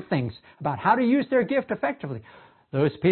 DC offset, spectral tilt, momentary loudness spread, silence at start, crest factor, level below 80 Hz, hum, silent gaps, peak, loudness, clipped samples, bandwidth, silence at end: under 0.1%; -11.5 dB/octave; 13 LU; 0 s; 18 dB; -62 dBFS; none; none; -6 dBFS; -25 LUFS; under 0.1%; 4.4 kHz; 0 s